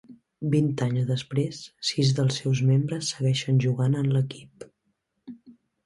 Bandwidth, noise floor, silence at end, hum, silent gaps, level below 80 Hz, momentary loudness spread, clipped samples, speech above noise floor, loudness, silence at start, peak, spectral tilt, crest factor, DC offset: 11.5 kHz; -75 dBFS; 0.35 s; none; none; -62 dBFS; 9 LU; under 0.1%; 51 dB; -25 LUFS; 0.1 s; -10 dBFS; -6 dB/octave; 14 dB; under 0.1%